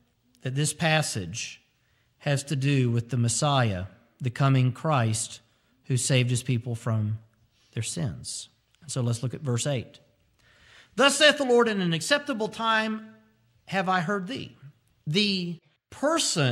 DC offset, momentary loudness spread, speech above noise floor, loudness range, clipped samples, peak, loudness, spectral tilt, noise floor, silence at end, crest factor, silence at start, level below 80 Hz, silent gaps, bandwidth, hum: under 0.1%; 15 LU; 42 dB; 7 LU; under 0.1%; -6 dBFS; -26 LUFS; -4.5 dB/octave; -68 dBFS; 0 s; 20 dB; 0.45 s; -64 dBFS; none; 14.5 kHz; none